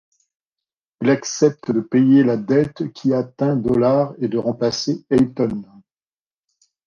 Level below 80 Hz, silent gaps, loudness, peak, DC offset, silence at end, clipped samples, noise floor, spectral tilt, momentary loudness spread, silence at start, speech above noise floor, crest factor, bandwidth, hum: -54 dBFS; none; -19 LUFS; -2 dBFS; under 0.1%; 1.25 s; under 0.1%; under -90 dBFS; -6.5 dB/octave; 9 LU; 1 s; over 72 dB; 16 dB; 7.2 kHz; none